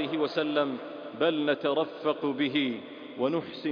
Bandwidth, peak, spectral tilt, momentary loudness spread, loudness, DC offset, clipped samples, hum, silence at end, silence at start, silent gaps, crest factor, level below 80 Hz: 5.2 kHz; -12 dBFS; -7 dB/octave; 9 LU; -29 LUFS; under 0.1%; under 0.1%; none; 0 s; 0 s; none; 16 dB; -76 dBFS